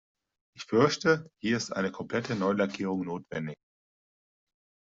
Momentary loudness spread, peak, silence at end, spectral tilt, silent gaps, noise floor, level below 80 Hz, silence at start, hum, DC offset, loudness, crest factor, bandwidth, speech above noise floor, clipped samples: 12 LU; -10 dBFS; 1.25 s; -5.5 dB/octave; none; under -90 dBFS; -68 dBFS; 0.55 s; none; under 0.1%; -29 LUFS; 20 dB; 7.8 kHz; over 61 dB; under 0.1%